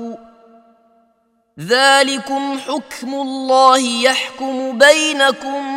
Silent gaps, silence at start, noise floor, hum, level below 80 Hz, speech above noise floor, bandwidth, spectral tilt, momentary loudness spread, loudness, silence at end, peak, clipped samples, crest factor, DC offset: none; 0 s; -61 dBFS; none; -64 dBFS; 46 dB; 16.5 kHz; -1.5 dB/octave; 13 LU; -14 LUFS; 0 s; 0 dBFS; under 0.1%; 16 dB; under 0.1%